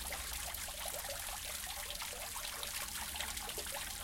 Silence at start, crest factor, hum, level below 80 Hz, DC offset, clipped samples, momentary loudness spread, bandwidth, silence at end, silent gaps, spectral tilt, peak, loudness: 0 s; 20 dB; none; -54 dBFS; under 0.1%; under 0.1%; 2 LU; 17 kHz; 0 s; none; -0.5 dB/octave; -22 dBFS; -40 LUFS